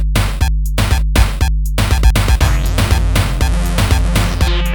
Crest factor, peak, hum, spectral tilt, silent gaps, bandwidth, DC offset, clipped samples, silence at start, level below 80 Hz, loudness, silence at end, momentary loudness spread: 12 dB; 0 dBFS; none; -5 dB/octave; none; 18.5 kHz; 0.2%; under 0.1%; 0 s; -14 dBFS; -15 LUFS; 0 s; 4 LU